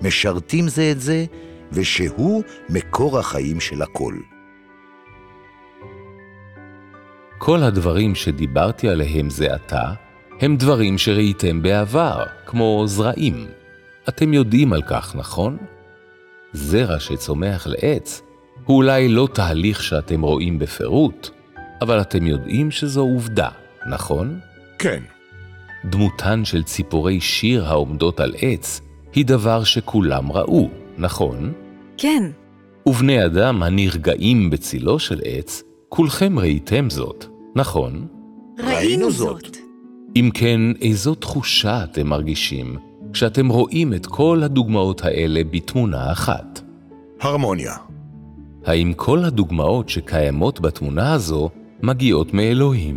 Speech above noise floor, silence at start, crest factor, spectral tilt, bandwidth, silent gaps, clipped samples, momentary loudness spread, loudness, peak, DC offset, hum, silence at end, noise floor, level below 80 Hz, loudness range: 29 dB; 0 s; 16 dB; -6 dB/octave; 17 kHz; none; under 0.1%; 13 LU; -19 LUFS; -2 dBFS; under 0.1%; none; 0 s; -47 dBFS; -36 dBFS; 5 LU